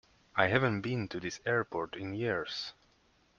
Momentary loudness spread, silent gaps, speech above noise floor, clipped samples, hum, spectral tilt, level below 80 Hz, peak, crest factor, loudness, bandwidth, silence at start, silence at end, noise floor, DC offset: 10 LU; none; 36 dB; under 0.1%; none; -5.5 dB/octave; -66 dBFS; -10 dBFS; 24 dB; -33 LUFS; 7.2 kHz; 0.35 s; 0.7 s; -69 dBFS; under 0.1%